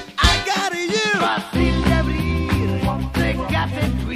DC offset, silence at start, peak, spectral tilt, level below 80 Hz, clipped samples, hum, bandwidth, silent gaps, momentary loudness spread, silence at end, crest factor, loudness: under 0.1%; 0 s; -2 dBFS; -5 dB/octave; -26 dBFS; under 0.1%; none; 15 kHz; none; 5 LU; 0 s; 18 dB; -20 LUFS